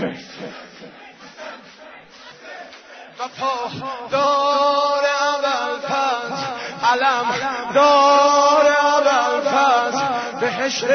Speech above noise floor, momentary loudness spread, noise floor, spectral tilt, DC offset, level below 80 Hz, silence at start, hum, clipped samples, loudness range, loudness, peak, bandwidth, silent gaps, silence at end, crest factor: 22 dB; 22 LU; -42 dBFS; -2.5 dB/octave; under 0.1%; -62 dBFS; 0 s; none; under 0.1%; 15 LU; -17 LUFS; -4 dBFS; 6.6 kHz; none; 0 s; 14 dB